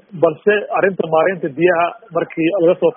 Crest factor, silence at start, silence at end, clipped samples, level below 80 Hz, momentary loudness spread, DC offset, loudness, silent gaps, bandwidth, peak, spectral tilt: 16 dB; 0.15 s; 0.05 s; under 0.1%; -62 dBFS; 5 LU; under 0.1%; -16 LUFS; none; 3.6 kHz; 0 dBFS; -2 dB/octave